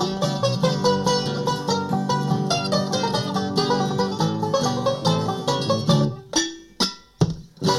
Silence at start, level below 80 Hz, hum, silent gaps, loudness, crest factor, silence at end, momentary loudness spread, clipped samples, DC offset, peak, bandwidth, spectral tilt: 0 s; -52 dBFS; none; none; -22 LUFS; 18 dB; 0 s; 4 LU; under 0.1%; under 0.1%; -6 dBFS; 15.5 kHz; -5 dB/octave